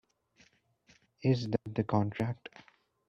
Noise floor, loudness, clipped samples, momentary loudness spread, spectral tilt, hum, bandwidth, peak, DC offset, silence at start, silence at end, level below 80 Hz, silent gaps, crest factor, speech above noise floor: -67 dBFS; -33 LUFS; under 0.1%; 10 LU; -8 dB/octave; none; 7.4 kHz; -14 dBFS; under 0.1%; 1.2 s; 0.75 s; -66 dBFS; none; 20 dB; 35 dB